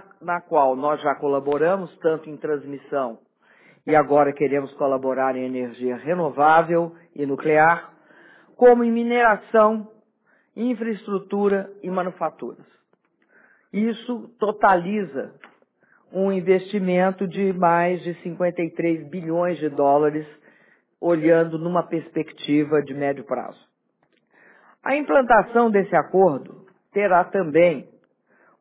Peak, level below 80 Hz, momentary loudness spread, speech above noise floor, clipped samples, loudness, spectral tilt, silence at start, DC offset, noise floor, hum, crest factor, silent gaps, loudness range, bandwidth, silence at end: -4 dBFS; -64 dBFS; 12 LU; 46 dB; under 0.1%; -21 LUFS; -10.5 dB/octave; 0.2 s; under 0.1%; -67 dBFS; none; 18 dB; none; 7 LU; 4 kHz; 0.75 s